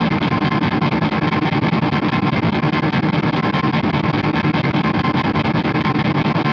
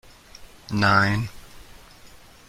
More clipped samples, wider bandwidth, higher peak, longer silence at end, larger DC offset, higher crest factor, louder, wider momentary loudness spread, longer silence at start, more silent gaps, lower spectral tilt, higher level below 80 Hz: neither; second, 6.8 kHz vs 15.5 kHz; about the same, -6 dBFS vs -4 dBFS; second, 0 s vs 0.4 s; neither; second, 12 dB vs 22 dB; first, -17 LUFS vs -21 LUFS; second, 0 LU vs 18 LU; second, 0 s vs 0.4 s; neither; first, -8 dB/octave vs -5.5 dB/octave; first, -42 dBFS vs -48 dBFS